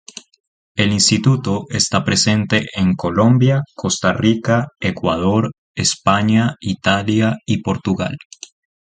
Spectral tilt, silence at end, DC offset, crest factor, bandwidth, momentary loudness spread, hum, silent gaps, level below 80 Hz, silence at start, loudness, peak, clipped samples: -4.5 dB/octave; 0.65 s; under 0.1%; 16 dB; 9.6 kHz; 9 LU; none; 5.58-5.75 s; -42 dBFS; 0.75 s; -17 LUFS; 0 dBFS; under 0.1%